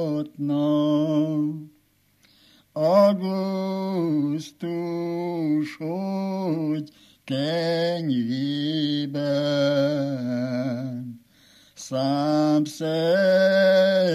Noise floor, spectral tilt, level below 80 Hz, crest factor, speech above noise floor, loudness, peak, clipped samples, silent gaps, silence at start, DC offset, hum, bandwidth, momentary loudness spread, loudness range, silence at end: -63 dBFS; -6.5 dB/octave; -76 dBFS; 18 dB; 40 dB; -23 LUFS; -6 dBFS; under 0.1%; none; 0 s; under 0.1%; none; 15 kHz; 12 LU; 3 LU; 0 s